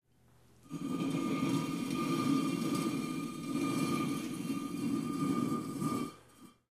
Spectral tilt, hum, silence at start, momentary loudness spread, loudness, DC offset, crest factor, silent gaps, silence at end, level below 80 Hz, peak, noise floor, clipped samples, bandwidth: -5.5 dB/octave; none; 0.65 s; 6 LU; -35 LUFS; under 0.1%; 16 dB; none; 0.25 s; -70 dBFS; -20 dBFS; -66 dBFS; under 0.1%; 15.5 kHz